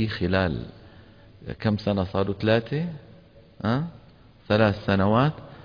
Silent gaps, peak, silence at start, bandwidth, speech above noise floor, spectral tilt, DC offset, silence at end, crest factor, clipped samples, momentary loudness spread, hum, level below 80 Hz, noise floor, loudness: none; -8 dBFS; 0 s; 5.2 kHz; 28 dB; -8.5 dB/octave; under 0.1%; 0 s; 16 dB; under 0.1%; 14 LU; none; -48 dBFS; -52 dBFS; -25 LUFS